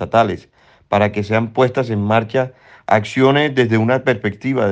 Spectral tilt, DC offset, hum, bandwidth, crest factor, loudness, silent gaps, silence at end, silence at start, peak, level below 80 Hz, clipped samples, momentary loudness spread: -7 dB/octave; under 0.1%; none; 9 kHz; 16 dB; -17 LUFS; none; 0 s; 0 s; 0 dBFS; -56 dBFS; under 0.1%; 7 LU